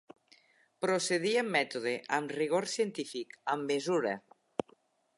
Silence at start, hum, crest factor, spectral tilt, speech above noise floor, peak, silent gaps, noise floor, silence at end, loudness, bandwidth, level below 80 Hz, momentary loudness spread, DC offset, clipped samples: 0.8 s; none; 20 dB; -3.5 dB/octave; 35 dB; -14 dBFS; none; -67 dBFS; 1 s; -33 LUFS; 11.5 kHz; -82 dBFS; 11 LU; under 0.1%; under 0.1%